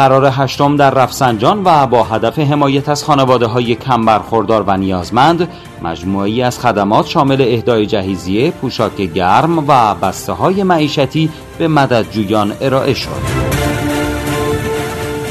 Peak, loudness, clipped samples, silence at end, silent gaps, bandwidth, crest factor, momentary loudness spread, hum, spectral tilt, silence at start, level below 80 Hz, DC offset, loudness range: 0 dBFS; -13 LUFS; 0.2%; 0 s; none; 14 kHz; 12 dB; 7 LU; none; -6 dB/octave; 0 s; -36 dBFS; under 0.1%; 3 LU